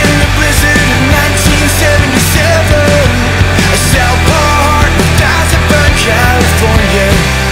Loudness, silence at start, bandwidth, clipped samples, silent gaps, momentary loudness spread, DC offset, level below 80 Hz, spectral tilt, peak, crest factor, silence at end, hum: -8 LUFS; 0 s; 16.5 kHz; under 0.1%; none; 1 LU; under 0.1%; -16 dBFS; -4 dB/octave; 0 dBFS; 8 dB; 0 s; none